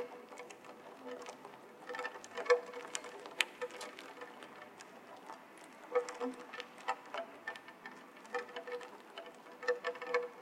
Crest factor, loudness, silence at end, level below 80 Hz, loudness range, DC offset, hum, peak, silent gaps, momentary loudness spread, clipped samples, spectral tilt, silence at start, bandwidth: 36 dB; -42 LUFS; 0 s; under -90 dBFS; 5 LU; under 0.1%; none; -6 dBFS; none; 17 LU; under 0.1%; -1.5 dB/octave; 0 s; 16 kHz